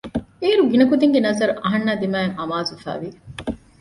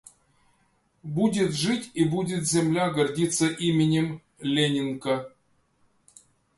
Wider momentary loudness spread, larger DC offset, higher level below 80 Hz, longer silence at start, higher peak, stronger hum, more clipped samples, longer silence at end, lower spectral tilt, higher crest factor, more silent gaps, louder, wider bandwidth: first, 16 LU vs 8 LU; neither; first, -50 dBFS vs -62 dBFS; second, 0.05 s vs 1.05 s; first, -4 dBFS vs -10 dBFS; neither; neither; second, 0.25 s vs 1.3 s; about the same, -6 dB/octave vs -5 dB/octave; about the same, 16 dB vs 18 dB; neither; first, -19 LUFS vs -25 LUFS; about the same, 11.5 kHz vs 11.5 kHz